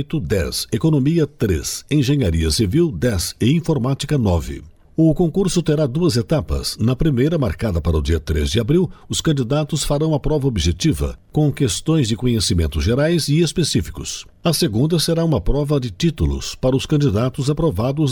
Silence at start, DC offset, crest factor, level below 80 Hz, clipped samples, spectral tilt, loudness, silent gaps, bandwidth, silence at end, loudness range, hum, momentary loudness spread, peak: 0 s; under 0.1%; 12 dB; -30 dBFS; under 0.1%; -6 dB/octave; -19 LUFS; none; 18 kHz; 0 s; 1 LU; none; 4 LU; -6 dBFS